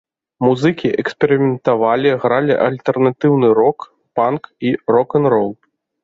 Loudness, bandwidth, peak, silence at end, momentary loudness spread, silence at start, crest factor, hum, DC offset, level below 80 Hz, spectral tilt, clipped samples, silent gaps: -16 LUFS; 7.6 kHz; -2 dBFS; 0.5 s; 6 LU; 0.4 s; 14 dB; none; under 0.1%; -58 dBFS; -8 dB/octave; under 0.1%; none